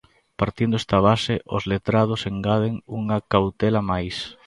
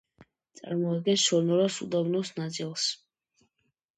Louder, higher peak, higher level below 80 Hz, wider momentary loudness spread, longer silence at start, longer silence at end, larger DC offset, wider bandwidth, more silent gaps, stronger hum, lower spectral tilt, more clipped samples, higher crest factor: first, -22 LUFS vs -28 LUFS; first, -2 dBFS vs -10 dBFS; first, -44 dBFS vs -76 dBFS; second, 8 LU vs 11 LU; first, 0.4 s vs 0.2 s; second, 0.15 s vs 1 s; neither; about the same, 11.5 kHz vs 10.5 kHz; neither; neither; first, -7 dB/octave vs -4.5 dB/octave; neither; about the same, 20 dB vs 18 dB